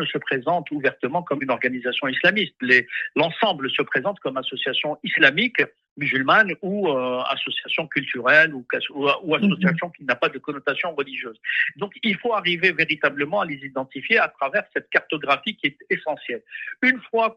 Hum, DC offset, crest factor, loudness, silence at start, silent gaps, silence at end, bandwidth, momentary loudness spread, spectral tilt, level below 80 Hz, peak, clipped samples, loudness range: none; under 0.1%; 22 dB; -21 LUFS; 0 s; 5.91-5.96 s; 0.05 s; 8 kHz; 10 LU; -6 dB/octave; -70 dBFS; -2 dBFS; under 0.1%; 3 LU